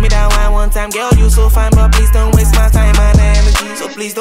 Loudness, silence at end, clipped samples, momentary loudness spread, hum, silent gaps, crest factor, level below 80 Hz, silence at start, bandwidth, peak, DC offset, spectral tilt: -11 LUFS; 0 s; under 0.1%; 7 LU; none; none; 8 dB; -8 dBFS; 0 s; 16 kHz; 0 dBFS; under 0.1%; -5 dB/octave